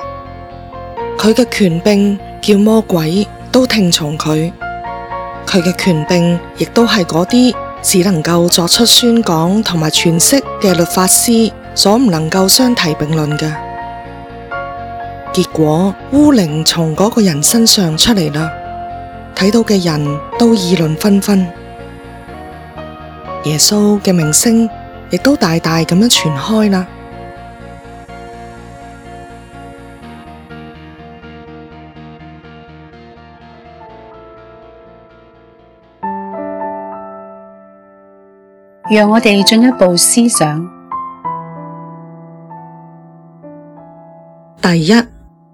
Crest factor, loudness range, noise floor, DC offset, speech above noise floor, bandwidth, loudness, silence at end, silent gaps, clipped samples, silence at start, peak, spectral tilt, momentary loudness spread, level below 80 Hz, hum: 14 dB; 20 LU; -44 dBFS; under 0.1%; 34 dB; over 20 kHz; -11 LUFS; 0.45 s; none; 0.3%; 0 s; 0 dBFS; -4 dB/octave; 24 LU; -40 dBFS; none